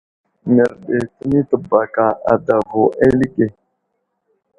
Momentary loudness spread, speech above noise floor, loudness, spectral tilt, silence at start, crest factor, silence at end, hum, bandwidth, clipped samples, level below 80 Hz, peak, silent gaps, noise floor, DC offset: 7 LU; 56 dB; -16 LUFS; -9 dB/octave; 0.45 s; 16 dB; 1.1 s; none; 10 kHz; under 0.1%; -46 dBFS; 0 dBFS; none; -71 dBFS; under 0.1%